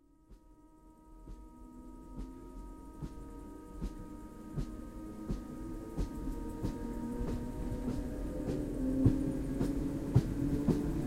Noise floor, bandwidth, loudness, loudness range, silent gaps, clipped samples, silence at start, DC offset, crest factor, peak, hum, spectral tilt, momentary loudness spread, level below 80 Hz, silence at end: -60 dBFS; 16 kHz; -37 LUFS; 16 LU; none; under 0.1%; 0.3 s; under 0.1%; 24 dB; -14 dBFS; none; -8.5 dB/octave; 19 LU; -44 dBFS; 0 s